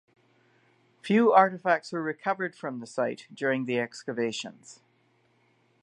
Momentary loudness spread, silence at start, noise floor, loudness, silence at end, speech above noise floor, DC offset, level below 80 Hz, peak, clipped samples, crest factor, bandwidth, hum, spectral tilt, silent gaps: 15 LU; 1.05 s; -67 dBFS; -27 LUFS; 1.1 s; 40 dB; under 0.1%; -82 dBFS; -6 dBFS; under 0.1%; 24 dB; 11 kHz; none; -5.5 dB/octave; none